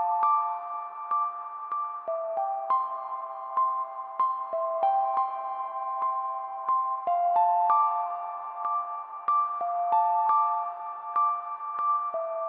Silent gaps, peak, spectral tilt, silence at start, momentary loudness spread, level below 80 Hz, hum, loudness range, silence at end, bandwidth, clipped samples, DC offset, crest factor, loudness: none; -12 dBFS; -5.5 dB/octave; 0 s; 10 LU; under -90 dBFS; none; 4 LU; 0 s; 4.7 kHz; under 0.1%; under 0.1%; 16 dB; -28 LUFS